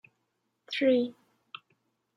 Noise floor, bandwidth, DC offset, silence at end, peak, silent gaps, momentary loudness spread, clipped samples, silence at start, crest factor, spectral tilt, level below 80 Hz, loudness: -79 dBFS; 10 kHz; under 0.1%; 1.05 s; -14 dBFS; none; 22 LU; under 0.1%; 0.7 s; 18 dB; -5 dB/octave; -88 dBFS; -28 LUFS